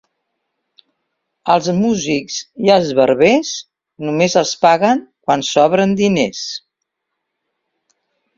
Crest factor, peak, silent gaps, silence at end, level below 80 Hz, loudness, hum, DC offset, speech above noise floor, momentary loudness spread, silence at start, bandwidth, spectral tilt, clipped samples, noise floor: 16 dB; 0 dBFS; none; 1.8 s; -56 dBFS; -15 LUFS; none; under 0.1%; 62 dB; 13 LU; 1.45 s; 7.6 kHz; -4.5 dB/octave; under 0.1%; -76 dBFS